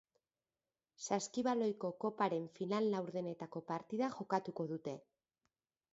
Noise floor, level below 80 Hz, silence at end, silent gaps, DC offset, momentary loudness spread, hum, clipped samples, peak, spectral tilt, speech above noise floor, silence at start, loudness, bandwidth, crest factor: under -90 dBFS; -84 dBFS; 0.95 s; none; under 0.1%; 9 LU; none; under 0.1%; -20 dBFS; -5.5 dB/octave; over 51 dB; 1 s; -40 LUFS; 7.6 kHz; 20 dB